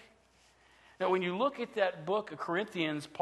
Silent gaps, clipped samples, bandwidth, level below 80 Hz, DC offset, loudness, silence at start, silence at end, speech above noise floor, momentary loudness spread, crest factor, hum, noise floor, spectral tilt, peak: none; under 0.1%; 12.5 kHz; -76 dBFS; under 0.1%; -34 LUFS; 0 s; 0 s; 33 dB; 4 LU; 20 dB; none; -66 dBFS; -5.5 dB/octave; -16 dBFS